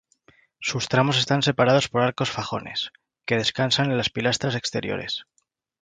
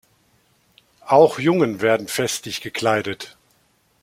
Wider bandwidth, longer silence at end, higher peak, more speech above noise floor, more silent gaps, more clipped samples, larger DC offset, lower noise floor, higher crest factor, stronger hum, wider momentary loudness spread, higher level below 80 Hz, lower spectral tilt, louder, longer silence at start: second, 9.6 kHz vs 16.5 kHz; second, 0.6 s vs 0.75 s; about the same, -4 dBFS vs -2 dBFS; second, 36 dB vs 43 dB; neither; neither; neither; about the same, -60 dBFS vs -62 dBFS; about the same, 20 dB vs 20 dB; neither; second, 10 LU vs 14 LU; first, -58 dBFS vs -64 dBFS; about the same, -4.5 dB/octave vs -4.5 dB/octave; second, -23 LUFS vs -19 LUFS; second, 0.6 s vs 1.05 s